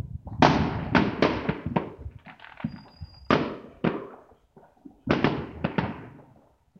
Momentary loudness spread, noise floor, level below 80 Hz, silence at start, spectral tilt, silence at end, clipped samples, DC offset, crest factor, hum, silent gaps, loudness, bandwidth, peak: 23 LU; -59 dBFS; -48 dBFS; 0.05 s; -7 dB/octave; 0.6 s; under 0.1%; under 0.1%; 26 dB; none; none; -27 LUFS; 7.4 kHz; -2 dBFS